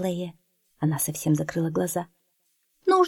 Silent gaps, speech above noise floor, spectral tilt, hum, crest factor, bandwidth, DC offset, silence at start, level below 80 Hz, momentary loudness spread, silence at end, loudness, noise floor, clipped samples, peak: none; 45 dB; -5.5 dB/octave; none; 18 dB; 17.5 kHz; under 0.1%; 0 s; -64 dBFS; 9 LU; 0 s; -27 LUFS; -71 dBFS; under 0.1%; -8 dBFS